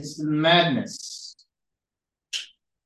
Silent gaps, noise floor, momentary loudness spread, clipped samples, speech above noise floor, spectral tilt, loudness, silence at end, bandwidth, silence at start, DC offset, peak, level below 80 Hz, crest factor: none; -89 dBFS; 21 LU; under 0.1%; 66 dB; -4.5 dB/octave; -23 LUFS; 0.4 s; 12.5 kHz; 0 s; under 0.1%; -6 dBFS; -74 dBFS; 22 dB